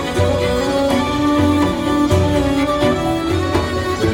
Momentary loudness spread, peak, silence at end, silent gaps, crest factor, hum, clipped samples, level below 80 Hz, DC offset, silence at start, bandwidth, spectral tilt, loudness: 3 LU; -2 dBFS; 0 s; none; 14 dB; none; under 0.1%; -32 dBFS; under 0.1%; 0 s; 17 kHz; -6 dB/octave; -16 LUFS